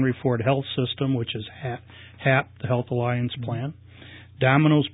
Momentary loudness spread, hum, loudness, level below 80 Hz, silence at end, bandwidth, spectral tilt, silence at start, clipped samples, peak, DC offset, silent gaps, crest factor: 15 LU; none; -24 LUFS; -54 dBFS; 0 s; 4 kHz; -11.5 dB/octave; 0 s; under 0.1%; -4 dBFS; under 0.1%; none; 20 dB